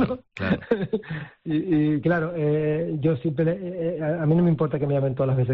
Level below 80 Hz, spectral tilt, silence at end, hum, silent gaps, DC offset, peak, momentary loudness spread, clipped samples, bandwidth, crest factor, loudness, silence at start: -54 dBFS; -8 dB/octave; 0 s; none; none; under 0.1%; -10 dBFS; 7 LU; under 0.1%; 4.8 kHz; 14 dB; -24 LUFS; 0 s